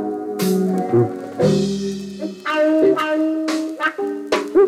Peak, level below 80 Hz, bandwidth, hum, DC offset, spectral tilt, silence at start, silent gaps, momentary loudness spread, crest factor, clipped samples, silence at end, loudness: -4 dBFS; -54 dBFS; 16 kHz; none; under 0.1%; -6 dB/octave; 0 s; none; 10 LU; 14 dB; under 0.1%; 0 s; -19 LUFS